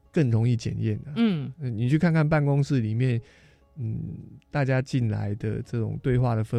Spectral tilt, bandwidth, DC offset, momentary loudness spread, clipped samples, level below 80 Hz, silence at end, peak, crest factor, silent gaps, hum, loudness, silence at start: -8 dB/octave; 9.6 kHz; under 0.1%; 10 LU; under 0.1%; -50 dBFS; 0 s; -10 dBFS; 16 dB; none; none; -26 LUFS; 0.15 s